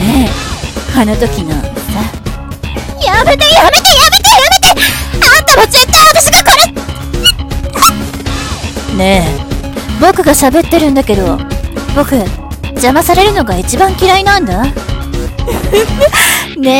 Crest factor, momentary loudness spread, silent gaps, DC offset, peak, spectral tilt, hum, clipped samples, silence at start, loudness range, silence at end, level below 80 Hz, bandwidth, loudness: 8 dB; 15 LU; none; under 0.1%; 0 dBFS; -3 dB/octave; none; 3%; 0 s; 7 LU; 0 s; -20 dBFS; over 20 kHz; -7 LUFS